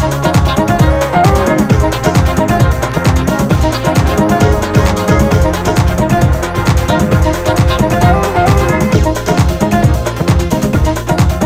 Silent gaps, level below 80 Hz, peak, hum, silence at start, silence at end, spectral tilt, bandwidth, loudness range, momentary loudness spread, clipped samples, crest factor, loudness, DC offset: none; -18 dBFS; 0 dBFS; none; 0 s; 0 s; -6 dB/octave; 16 kHz; 0 LU; 2 LU; under 0.1%; 10 dB; -11 LUFS; under 0.1%